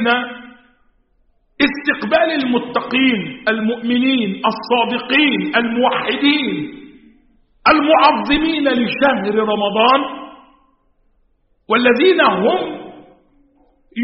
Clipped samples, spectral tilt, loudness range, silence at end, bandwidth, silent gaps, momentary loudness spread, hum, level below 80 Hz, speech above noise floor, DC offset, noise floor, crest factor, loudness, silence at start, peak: under 0.1%; -2 dB/octave; 3 LU; 0 s; 5.8 kHz; none; 9 LU; none; -48 dBFS; 44 dB; under 0.1%; -59 dBFS; 16 dB; -15 LUFS; 0 s; 0 dBFS